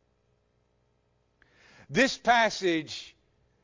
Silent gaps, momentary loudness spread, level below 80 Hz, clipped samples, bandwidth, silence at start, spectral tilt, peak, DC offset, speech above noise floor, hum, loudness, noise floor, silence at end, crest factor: none; 14 LU; -64 dBFS; under 0.1%; 7.6 kHz; 1.9 s; -3.5 dB/octave; -10 dBFS; under 0.1%; 45 dB; 60 Hz at -60 dBFS; -26 LUFS; -71 dBFS; 0.55 s; 20 dB